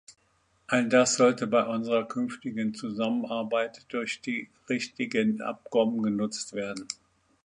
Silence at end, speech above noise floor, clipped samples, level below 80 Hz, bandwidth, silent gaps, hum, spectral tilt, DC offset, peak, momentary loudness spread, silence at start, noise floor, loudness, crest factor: 0.5 s; 41 dB; under 0.1%; -72 dBFS; 10.5 kHz; none; none; -4 dB/octave; under 0.1%; -8 dBFS; 11 LU; 0.1 s; -69 dBFS; -28 LUFS; 20 dB